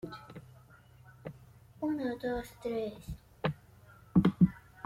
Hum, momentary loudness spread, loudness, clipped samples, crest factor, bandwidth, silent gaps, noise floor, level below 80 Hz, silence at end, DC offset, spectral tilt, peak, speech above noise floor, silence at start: none; 21 LU; -33 LUFS; under 0.1%; 22 dB; 13.5 kHz; none; -58 dBFS; -56 dBFS; 0.05 s; under 0.1%; -8.5 dB/octave; -14 dBFS; 22 dB; 0.05 s